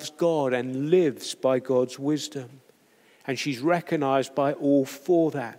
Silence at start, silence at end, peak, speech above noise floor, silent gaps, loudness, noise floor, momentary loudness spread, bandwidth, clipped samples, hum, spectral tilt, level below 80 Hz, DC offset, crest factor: 0 s; 0 s; -10 dBFS; 35 dB; none; -25 LUFS; -60 dBFS; 8 LU; 16 kHz; under 0.1%; none; -5.5 dB/octave; -80 dBFS; under 0.1%; 16 dB